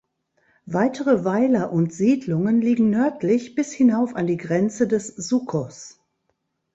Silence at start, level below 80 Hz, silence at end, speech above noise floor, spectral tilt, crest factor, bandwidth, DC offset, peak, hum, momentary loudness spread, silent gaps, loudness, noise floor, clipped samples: 0.65 s; -62 dBFS; 0.85 s; 53 dB; -7 dB/octave; 16 dB; 8 kHz; under 0.1%; -6 dBFS; none; 8 LU; none; -21 LUFS; -73 dBFS; under 0.1%